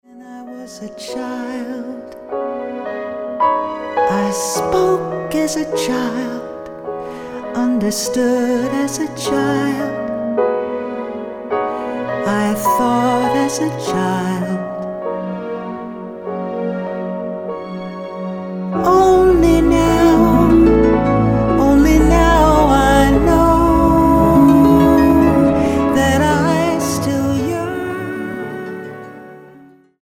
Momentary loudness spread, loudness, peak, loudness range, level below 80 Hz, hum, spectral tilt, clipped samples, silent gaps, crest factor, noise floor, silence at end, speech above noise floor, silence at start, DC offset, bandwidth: 16 LU; -15 LUFS; -2 dBFS; 11 LU; -28 dBFS; none; -6 dB/octave; under 0.1%; none; 14 dB; -44 dBFS; 0.45 s; 26 dB; 0.15 s; under 0.1%; 17 kHz